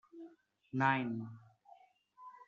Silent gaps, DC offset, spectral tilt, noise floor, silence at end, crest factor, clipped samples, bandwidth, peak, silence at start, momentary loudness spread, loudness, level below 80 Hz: none; under 0.1%; -5 dB/octave; -64 dBFS; 0.05 s; 24 dB; under 0.1%; 7.4 kHz; -16 dBFS; 0.15 s; 25 LU; -36 LUFS; -84 dBFS